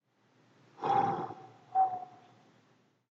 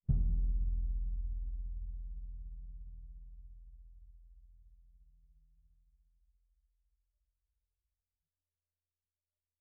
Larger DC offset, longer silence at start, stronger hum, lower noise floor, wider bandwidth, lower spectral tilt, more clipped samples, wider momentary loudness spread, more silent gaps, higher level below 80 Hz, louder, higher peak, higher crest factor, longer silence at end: neither; first, 0.8 s vs 0.1 s; neither; second, -69 dBFS vs under -90 dBFS; first, 7 kHz vs 0.7 kHz; second, -5 dB/octave vs -18.5 dB/octave; neither; second, 17 LU vs 24 LU; neither; second, -80 dBFS vs -40 dBFS; first, -33 LUFS vs -41 LUFS; about the same, -18 dBFS vs -18 dBFS; about the same, 18 dB vs 22 dB; second, 0.95 s vs 4.8 s